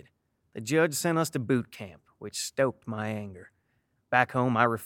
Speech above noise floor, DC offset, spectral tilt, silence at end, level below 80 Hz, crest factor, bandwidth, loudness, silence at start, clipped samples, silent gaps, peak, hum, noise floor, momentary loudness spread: 46 dB; under 0.1%; -5 dB/octave; 0 s; -70 dBFS; 24 dB; 17 kHz; -28 LUFS; 0.55 s; under 0.1%; none; -6 dBFS; none; -74 dBFS; 19 LU